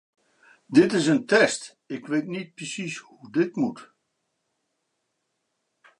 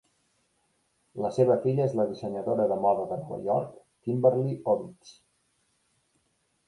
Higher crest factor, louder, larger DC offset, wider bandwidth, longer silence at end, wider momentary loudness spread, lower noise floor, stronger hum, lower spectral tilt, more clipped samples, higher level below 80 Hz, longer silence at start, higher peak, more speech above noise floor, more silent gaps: about the same, 22 dB vs 20 dB; first, -24 LUFS vs -27 LUFS; neither; about the same, 11 kHz vs 11 kHz; first, 2.15 s vs 1.55 s; first, 15 LU vs 10 LU; first, -77 dBFS vs -73 dBFS; neither; second, -4.5 dB/octave vs -9 dB/octave; neither; about the same, -74 dBFS vs -70 dBFS; second, 0.7 s vs 1.15 s; first, -4 dBFS vs -8 dBFS; first, 53 dB vs 46 dB; neither